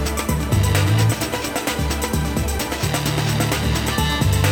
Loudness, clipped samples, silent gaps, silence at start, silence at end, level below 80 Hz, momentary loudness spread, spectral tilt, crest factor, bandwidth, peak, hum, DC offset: -20 LUFS; under 0.1%; none; 0 s; 0 s; -28 dBFS; 5 LU; -4.5 dB/octave; 18 dB; 18.5 kHz; 0 dBFS; none; under 0.1%